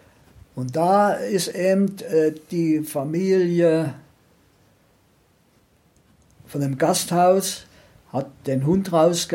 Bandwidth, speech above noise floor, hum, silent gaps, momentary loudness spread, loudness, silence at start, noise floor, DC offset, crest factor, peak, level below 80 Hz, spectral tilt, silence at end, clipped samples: 16.5 kHz; 40 dB; none; none; 12 LU; -21 LUFS; 0.55 s; -60 dBFS; under 0.1%; 16 dB; -6 dBFS; -60 dBFS; -5.5 dB/octave; 0 s; under 0.1%